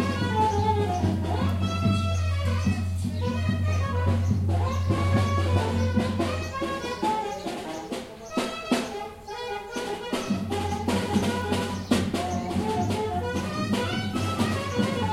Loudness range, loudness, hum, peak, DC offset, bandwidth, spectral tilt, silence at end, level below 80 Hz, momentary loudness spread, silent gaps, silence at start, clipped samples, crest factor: 5 LU; -27 LUFS; none; -10 dBFS; under 0.1%; 13.5 kHz; -6 dB/octave; 0 s; -50 dBFS; 8 LU; none; 0 s; under 0.1%; 16 dB